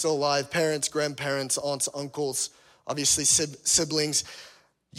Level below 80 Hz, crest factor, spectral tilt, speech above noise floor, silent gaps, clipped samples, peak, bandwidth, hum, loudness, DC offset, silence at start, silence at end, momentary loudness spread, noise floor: -62 dBFS; 20 dB; -2 dB/octave; 25 dB; none; under 0.1%; -8 dBFS; 16 kHz; none; -25 LUFS; under 0.1%; 0 s; 0 s; 11 LU; -51 dBFS